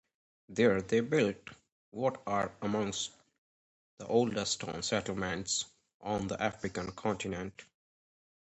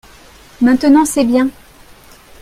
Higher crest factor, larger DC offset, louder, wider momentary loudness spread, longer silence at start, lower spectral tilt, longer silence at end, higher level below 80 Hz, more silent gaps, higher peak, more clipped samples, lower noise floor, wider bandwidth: first, 20 dB vs 14 dB; neither; second, -33 LUFS vs -13 LUFS; first, 14 LU vs 6 LU; about the same, 0.5 s vs 0.6 s; about the same, -4 dB/octave vs -4 dB/octave; about the same, 0.95 s vs 0.9 s; second, -62 dBFS vs -46 dBFS; first, 1.72-1.92 s, 3.38-3.97 s, 5.94-6.00 s vs none; second, -14 dBFS vs 0 dBFS; neither; first, under -90 dBFS vs -42 dBFS; second, 8.4 kHz vs 15.5 kHz